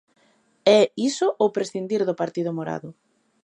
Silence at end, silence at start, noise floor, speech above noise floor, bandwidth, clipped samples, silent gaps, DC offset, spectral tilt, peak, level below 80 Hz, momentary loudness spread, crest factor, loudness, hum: 0.55 s; 0.65 s; -63 dBFS; 41 dB; 10.5 kHz; under 0.1%; none; under 0.1%; -5 dB/octave; -4 dBFS; -74 dBFS; 13 LU; 20 dB; -22 LUFS; none